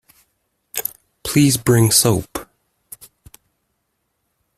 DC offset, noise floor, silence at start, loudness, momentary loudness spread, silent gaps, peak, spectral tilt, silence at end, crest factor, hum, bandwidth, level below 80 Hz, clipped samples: under 0.1%; -72 dBFS; 0.75 s; -16 LUFS; 25 LU; none; 0 dBFS; -4.5 dB/octave; 2.15 s; 20 dB; none; 16 kHz; -48 dBFS; under 0.1%